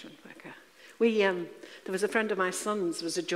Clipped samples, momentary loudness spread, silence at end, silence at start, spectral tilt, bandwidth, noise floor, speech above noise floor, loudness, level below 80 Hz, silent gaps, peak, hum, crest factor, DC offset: under 0.1%; 22 LU; 0 s; 0 s; -3.5 dB/octave; 15.5 kHz; -52 dBFS; 23 dB; -29 LUFS; -82 dBFS; none; -12 dBFS; none; 20 dB; under 0.1%